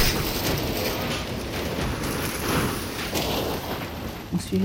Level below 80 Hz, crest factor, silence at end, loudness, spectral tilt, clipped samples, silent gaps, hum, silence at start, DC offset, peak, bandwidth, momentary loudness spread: -38 dBFS; 18 dB; 0 s; -27 LUFS; -4 dB/octave; under 0.1%; none; none; 0 s; under 0.1%; -8 dBFS; 17 kHz; 6 LU